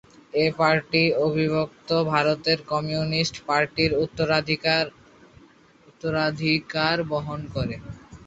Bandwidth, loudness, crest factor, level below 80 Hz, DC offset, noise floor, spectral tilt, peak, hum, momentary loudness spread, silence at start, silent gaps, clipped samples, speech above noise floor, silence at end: 8 kHz; -23 LUFS; 20 dB; -52 dBFS; under 0.1%; -55 dBFS; -5.5 dB/octave; -4 dBFS; none; 9 LU; 0.35 s; none; under 0.1%; 31 dB; 0.1 s